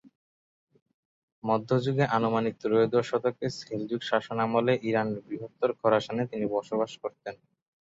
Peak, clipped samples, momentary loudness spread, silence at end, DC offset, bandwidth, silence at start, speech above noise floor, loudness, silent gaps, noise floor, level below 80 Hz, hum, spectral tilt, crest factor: -10 dBFS; under 0.1%; 11 LU; 0.6 s; under 0.1%; 8 kHz; 0.05 s; over 62 dB; -28 LUFS; 0.16-0.67 s, 0.82-0.86 s, 0.94-1.42 s; under -90 dBFS; -68 dBFS; none; -7 dB/octave; 20 dB